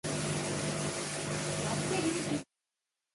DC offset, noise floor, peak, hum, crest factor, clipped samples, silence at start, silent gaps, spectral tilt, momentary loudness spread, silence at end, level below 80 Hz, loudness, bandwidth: under 0.1%; -89 dBFS; -20 dBFS; none; 14 dB; under 0.1%; 0.05 s; none; -4 dB/octave; 4 LU; 0.7 s; -60 dBFS; -34 LUFS; 11.5 kHz